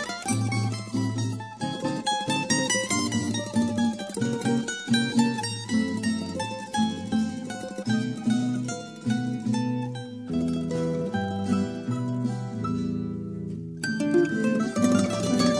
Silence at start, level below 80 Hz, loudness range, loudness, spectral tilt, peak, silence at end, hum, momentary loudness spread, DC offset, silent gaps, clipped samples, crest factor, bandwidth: 0 s; -58 dBFS; 3 LU; -27 LUFS; -5 dB/octave; -8 dBFS; 0 s; none; 9 LU; under 0.1%; none; under 0.1%; 18 dB; 11 kHz